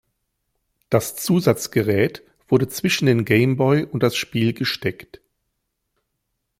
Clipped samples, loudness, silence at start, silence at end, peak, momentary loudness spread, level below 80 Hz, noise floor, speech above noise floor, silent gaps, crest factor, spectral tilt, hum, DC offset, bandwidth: under 0.1%; -20 LUFS; 0.9 s; 1.55 s; -2 dBFS; 6 LU; -56 dBFS; -76 dBFS; 56 dB; none; 20 dB; -5.5 dB/octave; none; under 0.1%; 16.5 kHz